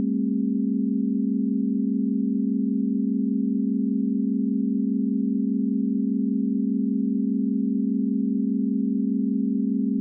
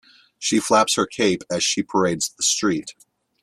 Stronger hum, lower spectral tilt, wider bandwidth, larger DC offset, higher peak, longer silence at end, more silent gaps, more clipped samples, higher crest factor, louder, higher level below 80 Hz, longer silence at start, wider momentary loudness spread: neither; first, -22.5 dB/octave vs -2.5 dB/octave; second, 0.5 kHz vs 15 kHz; neither; second, -16 dBFS vs -2 dBFS; second, 0 s vs 0.5 s; neither; neither; second, 8 dB vs 20 dB; second, -24 LUFS vs -20 LUFS; second, -86 dBFS vs -60 dBFS; second, 0 s vs 0.4 s; second, 0 LU vs 7 LU